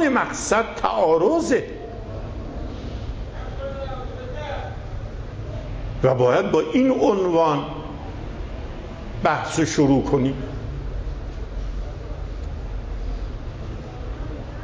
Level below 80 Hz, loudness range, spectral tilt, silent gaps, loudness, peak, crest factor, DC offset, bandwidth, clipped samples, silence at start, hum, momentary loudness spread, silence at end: -34 dBFS; 11 LU; -6 dB/octave; none; -24 LUFS; -4 dBFS; 18 dB; under 0.1%; 8 kHz; under 0.1%; 0 s; none; 16 LU; 0 s